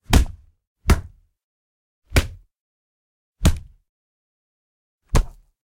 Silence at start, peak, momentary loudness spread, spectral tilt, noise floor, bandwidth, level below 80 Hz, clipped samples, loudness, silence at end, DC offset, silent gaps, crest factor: 0.1 s; 0 dBFS; 14 LU; -5 dB/octave; -35 dBFS; 16.5 kHz; -26 dBFS; under 0.1%; -23 LUFS; 0.45 s; under 0.1%; 0.67-0.76 s, 1.44-2.02 s, 2.60-3.33 s, 3.89-4.99 s; 24 dB